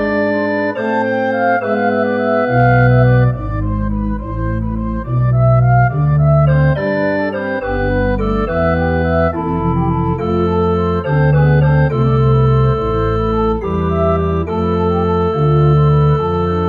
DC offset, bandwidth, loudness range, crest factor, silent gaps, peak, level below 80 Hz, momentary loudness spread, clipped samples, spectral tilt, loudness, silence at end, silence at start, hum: under 0.1%; 5.6 kHz; 2 LU; 12 dB; none; 0 dBFS; -26 dBFS; 7 LU; under 0.1%; -10 dB/octave; -14 LUFS; 0 s; 0 s; none